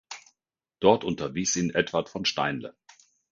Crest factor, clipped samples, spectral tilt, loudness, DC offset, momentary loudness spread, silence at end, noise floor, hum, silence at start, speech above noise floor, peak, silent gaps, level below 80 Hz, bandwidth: 24 dB; under 0.1%; -3.5 dB/octave; -26 LUFS; under 0.1%; 19 LU; 0.6 s; -84 dBFS; none; 0.1 s; 58 dB; -4 dBFS; none; -60 dBFS; 10 kHz